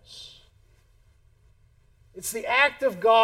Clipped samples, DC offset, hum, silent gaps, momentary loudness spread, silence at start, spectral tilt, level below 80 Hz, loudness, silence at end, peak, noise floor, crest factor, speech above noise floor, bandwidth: under 0.1%; under 0.1%; none; none; 23 LU; 0.1 s; -1.5 dB/octave; -60 dBFS; -23 LUFS; 0 s; -8 dBFS; -59 dBFS; 20 dB; 38 dB; 17 kHz